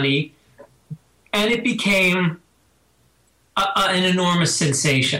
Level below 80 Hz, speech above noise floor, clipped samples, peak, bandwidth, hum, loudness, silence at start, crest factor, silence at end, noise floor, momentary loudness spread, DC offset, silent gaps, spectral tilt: -54 dBFS; 42 dB; under 0.1%; -4 dBFS; 16 kHz; none; -19 LUFS; 0 s; 16 dB; 0 s; -61 dBFS; 23 LU; under 0.1%; none; -3.5 dB/octave